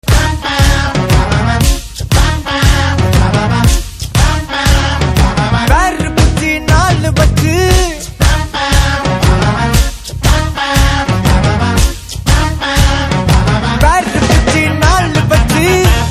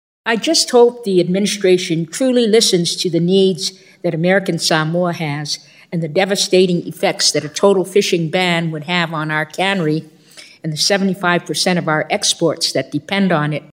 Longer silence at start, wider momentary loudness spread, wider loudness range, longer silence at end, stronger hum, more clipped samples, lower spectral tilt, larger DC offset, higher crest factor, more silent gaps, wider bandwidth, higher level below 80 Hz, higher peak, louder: second, 0.05 s vs 0.25 s; second, 4 LU vs 9 LU; about the same, 1 LU vs 3 LU; about the same, 0 s vs 0.1 s; neither; neither; about the same, -5 dB/octave vs -4 dB/octave; neither; second, 10 dB vs 16 dB; neither; about the same, 15.5 kHz vs 16 kHz; first, -14 dBFS vs -70 dBFS; about the same, 0 dBFS vs 0 dBFS; first, -11 LUFS vs -16 LUFS